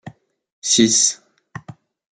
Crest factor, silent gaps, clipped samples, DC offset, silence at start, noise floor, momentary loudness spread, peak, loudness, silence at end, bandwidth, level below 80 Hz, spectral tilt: 20 dB; 0.52-0.62 s; under 0.1%; under 0.1%; 0.05 s; -42 dBFS; 24 LU; -2 dBFS; -15 LUFS; 0.4 s; 11 kHz; -62 dBFS; -2 dB/octave